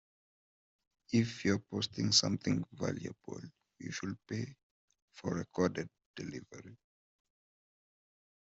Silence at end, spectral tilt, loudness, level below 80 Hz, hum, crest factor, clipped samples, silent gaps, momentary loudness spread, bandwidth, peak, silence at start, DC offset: 1.65 s; -4 dB/octave; -35 LUFS; -70 dBFS; none; 26 dB; under 0.1%; 4.63-4.88 s, 5.02-5.08 s, 6.06-6.14 s; 20 LU; 8.2 kHz; -12 dBFS; 1.1 s; under 0.1%